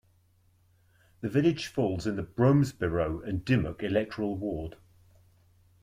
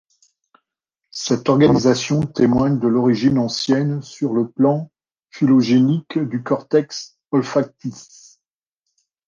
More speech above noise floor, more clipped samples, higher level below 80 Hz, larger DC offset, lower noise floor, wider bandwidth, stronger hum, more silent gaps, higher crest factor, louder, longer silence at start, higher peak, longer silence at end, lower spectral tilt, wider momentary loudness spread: second, 37 dB vs 64 dB; neither; about the same, -52 dBFS vs -52 dBFS; neither; second, -65 dBFS vs -81 dBFS; first, 15 kHz vs 7.4 kHz; neither; neither; about the same, 18 dB vs 16 dB; second, -29 LUFS vs -18 LUFS; about the same, 1.2 s vs 1.15 s; second, -12 dBFS vs -2 dBFS; second, 1.1 s vs 1.25 s; about the same, -7.5 dB/octave vs -6.5 dB/octave; second, 10 LU vs 13 LU